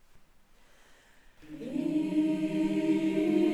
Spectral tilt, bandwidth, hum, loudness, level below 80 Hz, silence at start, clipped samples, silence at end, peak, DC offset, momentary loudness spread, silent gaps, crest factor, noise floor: -7 dB/octave; 11.5 kHz; none; -29 LUFS; -60 dBFS; 0.15 s; under 0.1%; 0 s; -16 dBFS; under 0.1%; 10 LU; none; 14 dB; -58 dBFS